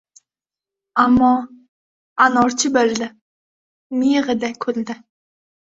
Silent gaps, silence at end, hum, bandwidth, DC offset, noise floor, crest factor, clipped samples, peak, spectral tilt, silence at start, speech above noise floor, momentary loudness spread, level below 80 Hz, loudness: 1.69-2.16 s, 3.22-3.90 s; 0.8 s; none; 7.8 kHz; under 0.1%; -89 dBFS; 18 dB; under 0.1%; -2 dBFS; -3.5 dB/octave; 0.95 s; 73 dB; 16 LU; -54 dBFS; -18 LUFS